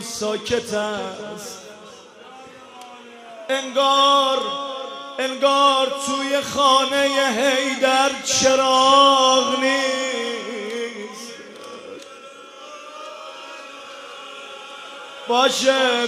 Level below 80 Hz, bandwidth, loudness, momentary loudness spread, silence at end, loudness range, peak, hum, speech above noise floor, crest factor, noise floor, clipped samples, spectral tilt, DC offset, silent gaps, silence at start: -64 dBFS; 15.5 kHz; -18 LUFS; 22 LU; 0 s; 20 LU; -2 dBFS; none; 24 dB; 18 dB; -42 dBFS; under 0.1%; -1.5 dB/octave; under 0.1%; none; 0 s